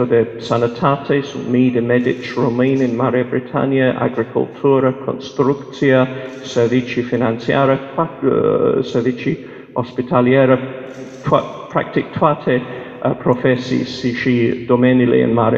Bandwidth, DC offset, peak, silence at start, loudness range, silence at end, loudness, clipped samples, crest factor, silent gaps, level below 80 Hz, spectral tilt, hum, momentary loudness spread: 7.4 kHz; under 0.1%; 0 dBFS; 0 s; 1 LU; 0 s; -17 LUFS; under 0.1%; 16 dB; none; -52 dBFS; -7.5 dB/octave; none; 9 LU